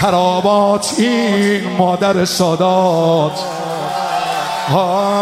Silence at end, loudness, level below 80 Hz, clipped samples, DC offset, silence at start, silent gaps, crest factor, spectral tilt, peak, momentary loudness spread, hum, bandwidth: 0 s; -14 LUFS; -54 dBFS; under 0.1%; under 0.1%; 0 s; none; 14 dB; -5 dB/octave; 0 dBFS; 6 LU; none; 15.5 kHz